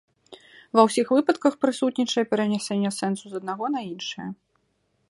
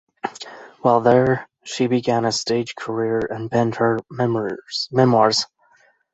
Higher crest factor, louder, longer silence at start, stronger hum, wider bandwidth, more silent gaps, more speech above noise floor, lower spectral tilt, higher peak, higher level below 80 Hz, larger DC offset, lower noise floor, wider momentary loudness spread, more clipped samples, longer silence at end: about the same, 22 dB vs 18 dB; second, -24 LUFS vs -20 LUFS; about the same, 0.3 s vs 0.25 s; neither; first, 11.5 kHz vs 8.4 kHz; neither; first, 47 dB vs 39 dB; about the same, -5 dB/octave vs -5 dB/octave; about the same, -2 dBFS vs -2 dBFS; second, -72 dBFS vs -58 dBFS; neither; first, -71 dBFS vs -58 dBFS; second, 13 LU vs 16 LU; neither; about the same, 0.75 s vs 0.7 s